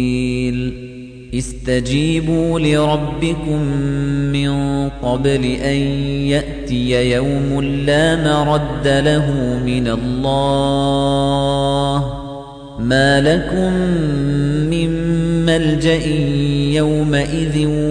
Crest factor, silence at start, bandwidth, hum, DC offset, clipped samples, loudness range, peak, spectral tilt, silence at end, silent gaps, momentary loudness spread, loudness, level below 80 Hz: 14 dB; 0 s; 10 kHz; none; under 0.1%; under 0.1%; 2 LU; -2 dBFS; -6.5 dB/octave; 0 s; none; 6 LU; -16 LUFS; -30 dBFS